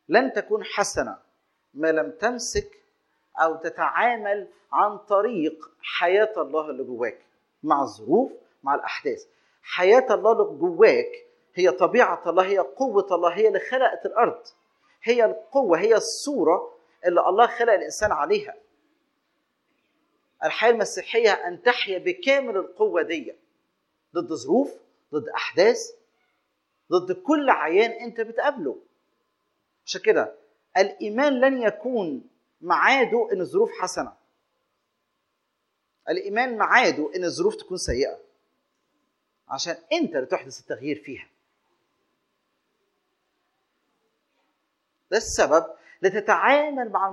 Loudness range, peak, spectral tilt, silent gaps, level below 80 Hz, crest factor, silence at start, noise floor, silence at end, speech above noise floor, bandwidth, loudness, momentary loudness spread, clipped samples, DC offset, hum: 8 LU; -2 dBFS; -3.5 dB/octave; none; -56 dBFS; 22 dB; 0.1 s; -76 dBFS; 0 s; 54 dB; 12 kHz; -23 LUFS; 13 LU; under 0.1%; under 0.1%; none